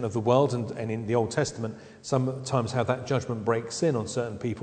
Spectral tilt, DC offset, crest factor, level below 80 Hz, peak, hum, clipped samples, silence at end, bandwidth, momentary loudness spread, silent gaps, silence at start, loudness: -6 dB/octave; under 0.1%; 20 dB; -60 dBFS; -8 dBFS; none; under 0.1%; 0 s; 9.4 kHz; 8 LU; none; 0 s; -28 LUFS